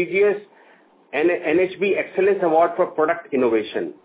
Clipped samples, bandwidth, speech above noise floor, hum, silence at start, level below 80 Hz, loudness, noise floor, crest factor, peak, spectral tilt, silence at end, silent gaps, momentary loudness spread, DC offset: under 0.1%; 4 kHz; 33 dB; none; 0 s; -64 dBFS; -20 LUFS; -53 dBFS; 14 dB; -6 dBFS; -9.5 dB/octave; 0.15 s; none; 5 LU; under 0.1%